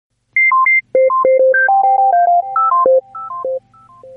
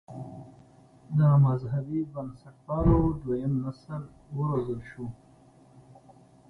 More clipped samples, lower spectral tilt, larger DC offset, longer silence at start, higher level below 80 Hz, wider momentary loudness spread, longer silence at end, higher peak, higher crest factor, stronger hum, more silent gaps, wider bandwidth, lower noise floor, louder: neither; second, -7 dB/octave vs -11 dB/octave; neither; first, 0.35 s vs 0.1 s; second, -66 dBFS vs -42 dBFS; second, 13 LU vs 19 LU; second, 0 s vs 1.35 s; first, -2 dBFS vs -10 dBFS; second, 12 dB vs 20 dB; first, 50 Hz at -65 dBFS vs none; neither; second, 2.5 kHz vs 4.6 kHz; second, -42 dBFS vs -56 dBFS; first, -12 LUFS vs -27 LUFS